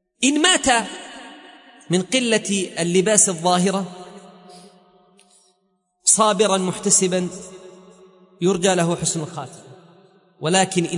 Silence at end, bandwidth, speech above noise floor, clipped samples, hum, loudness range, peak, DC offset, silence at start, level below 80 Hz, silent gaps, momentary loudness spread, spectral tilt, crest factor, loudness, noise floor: 0 s; 11 kHz; 49 dB; under 0.1%; none; 4 LU; 0 dBFS; under 0.1%; 0.2 s; -58 dBFS; none; 20 LU; -3 dB/octave; 20 dB; -18 LUFS; -68 dBFS